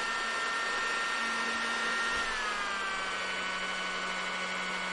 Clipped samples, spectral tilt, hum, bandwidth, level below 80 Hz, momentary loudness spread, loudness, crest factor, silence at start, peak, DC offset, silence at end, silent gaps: under 0.1%; -1 dB/octave; none; 11.5 kHz; -58 dBFS; 3 LU; -31 LUFS; 14 dB; 0 s; -20 dBFS; under 0.1%; 0 s; none